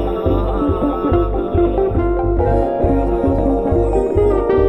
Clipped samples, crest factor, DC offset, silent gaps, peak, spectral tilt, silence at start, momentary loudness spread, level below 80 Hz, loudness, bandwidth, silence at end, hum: under 0.1%; 12 dB; under 0.1%; none; -2 dBFS; -10 dB/octave; 0 s; 3 LU; -22 dBFS; -17 LUFS; 8.6 kHz; 0 s; none